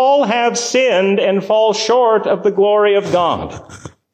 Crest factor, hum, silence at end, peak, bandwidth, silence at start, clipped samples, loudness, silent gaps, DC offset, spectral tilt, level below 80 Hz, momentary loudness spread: 10 dB; none; 0.25 s; -4 dBFS; 9.8 kHz; 0 s; under 0.1%; -14 LUFS; none; under 0.1%; -4 dB/octave; -48 dBFS; 5 LU